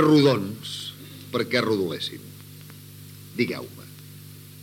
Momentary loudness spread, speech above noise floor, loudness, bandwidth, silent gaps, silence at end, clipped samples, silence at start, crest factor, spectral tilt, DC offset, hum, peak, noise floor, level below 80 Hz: 21 LU; 21 dB; -25 LUFS; 17 kHz; none; 0 s; under 0.1%; 0 s; 20 dB; -5.5 dB/octave; under 0.1%; 50 Hz at -45 dBFS; -6 dBFS; -44 dBFS; -68 dBFS